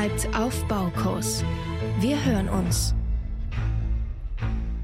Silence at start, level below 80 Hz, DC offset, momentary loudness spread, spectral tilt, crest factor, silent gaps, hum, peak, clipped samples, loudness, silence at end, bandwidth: 0 s; -30 dBFS; under 0.1%; 7 LU; -5.5 dB/octave; 14 dB; none; none; -10 dBFS; under 0.1%; -27 LUFS; 0 s; 16 kHz